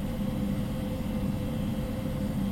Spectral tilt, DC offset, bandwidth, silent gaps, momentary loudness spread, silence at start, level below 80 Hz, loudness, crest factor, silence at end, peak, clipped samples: -7.5 dB/octave; under 0.1%; 16 kHz; none; 2 LU; 0 s; -38 dBFS; -32 LUFS; 12 dB; 0 s; -18 dBFS; under 0.1%